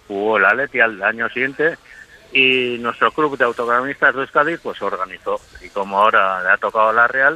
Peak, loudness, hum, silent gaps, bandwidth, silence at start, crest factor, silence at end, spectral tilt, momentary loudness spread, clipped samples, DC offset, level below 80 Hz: -2 dBFS; -17 LUFS; none; none; 13.5 kHz; 0.1 s; 16 dB; 0 s; -4.5 dB/octave; 11 LU; under 0.1%; under 0.1%; -56 dBFS